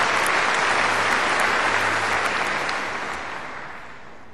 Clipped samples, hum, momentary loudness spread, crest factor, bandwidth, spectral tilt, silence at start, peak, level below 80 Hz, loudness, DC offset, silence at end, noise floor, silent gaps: under 0.1%; none; 15 LU; 18 dB; 13 kHz; -2 dB/octave; 0 s; -6 dBFS; -54 dBFS; -21 LUFS; 1%; 0 s; -42 dBFS; none